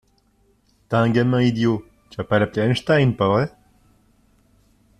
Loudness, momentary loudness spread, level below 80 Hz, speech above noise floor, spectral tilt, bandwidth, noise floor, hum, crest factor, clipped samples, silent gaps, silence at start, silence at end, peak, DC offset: -20 LUFS; 10 LU; -52 dBFS; 42 dB; -7.5 dB/octave; 11 kHz; -61 dBFS; none; 18 dB; under 0.1%; none; 0.9 s; 1.5 s; -4 dBFS; under 0.1%